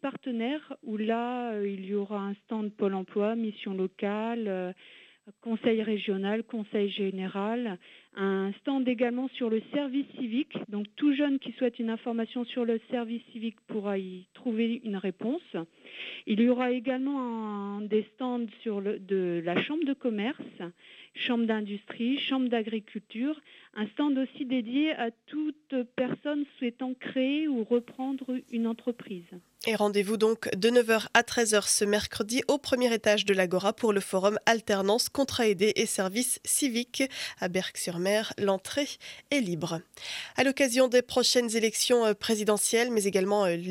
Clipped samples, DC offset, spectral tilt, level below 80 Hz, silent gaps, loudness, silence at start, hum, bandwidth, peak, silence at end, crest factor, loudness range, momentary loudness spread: under 0.1%; under 0.1%; -3.5 dB/octave; -70 dBFS; none; -29 LUFS; 0.05 s; none; 16.5 kHz; -8 dBFS; 0 s; 22 dB; 6 LU; 11 LU